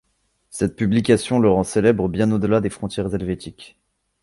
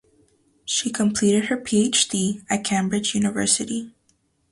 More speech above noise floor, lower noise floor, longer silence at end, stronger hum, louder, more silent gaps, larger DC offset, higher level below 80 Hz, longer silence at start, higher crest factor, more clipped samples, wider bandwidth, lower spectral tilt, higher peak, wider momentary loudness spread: first, 48 dB vs 44 dB; about the same, -67 dBFS vs -66 dBFS; about the same, 0.55 s vs 0.6 s; neither; about the same, -20 LUFS vs -21 LUFS; neither; neither; first, -44 dBFS vs -58 dBFS; about the same, 0.55 s vs 0.65 s; about the same, 18 dB vs 20 dB; neither; about the same, 11.5 kHz vs 11.5 kHz; first, -6.5 dB/octave vs -3.5 dB/octave; about the same, -2 dBFS vs -4 dBFS; first, 11 LU vs 8 LU